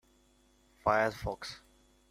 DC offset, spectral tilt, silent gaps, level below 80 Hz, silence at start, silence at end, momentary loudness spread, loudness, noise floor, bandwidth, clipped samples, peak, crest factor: under 0.1%; -5 dB/octave; none; -56 dBFS; 0.85 s; 0.55 s; 16 LU; -33 LUFS; -67 dBFS; 15.5 kHz; under 0.1%; -14 dBFS; 22 dB